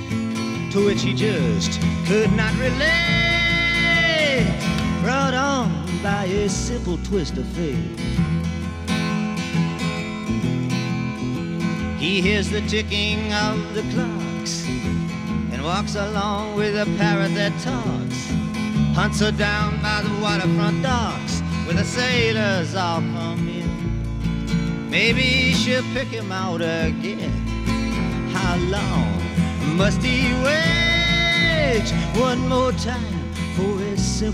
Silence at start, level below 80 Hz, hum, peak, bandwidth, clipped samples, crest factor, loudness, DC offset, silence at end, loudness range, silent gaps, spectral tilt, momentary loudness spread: 0 s; -34 dBFS; none; -4 dBFS; 13.5 kHz; under 0.1%; 16 dB; -21 LUFS; under 0.1%; 0 s; 6 LU; none; -5 dB/octave; 8 LU